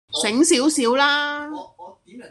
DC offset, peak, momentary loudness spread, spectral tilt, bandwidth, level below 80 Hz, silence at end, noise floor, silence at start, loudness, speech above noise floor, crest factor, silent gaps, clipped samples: under 0.1%; -4 dBFS; 15 LU; -1.5 dB/octave; 12.5 kHz; -64 dBFS; 0 s; -42 dBFS; 0.1 s; -18 LUFS; 23 dB; 18 dB; none; under 0.1%